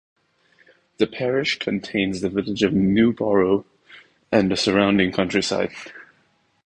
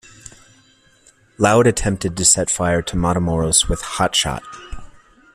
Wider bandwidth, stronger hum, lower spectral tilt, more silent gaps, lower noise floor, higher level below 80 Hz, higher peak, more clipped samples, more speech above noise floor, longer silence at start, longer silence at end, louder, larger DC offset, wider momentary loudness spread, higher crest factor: second, 9.8 kHz vs 15 kHz; neither; first, -5.5 dB/octave vs -3.5 dB/octave; neither; first, -64 dBFS vs -54 dBFS; second, -52 dBFS vs -34 dBFS; second, -4 dBFS vs 0 dBFS; neither; first, 43 dB vs 36 dB; first, 1 s vs 0.25 s; first, 0.65 s vs 0.45 s; second, -21 LUFS vs -17 LUFS; neither; second, 7 LU vs 13 LU; about the same, 18 dB vs 20 dB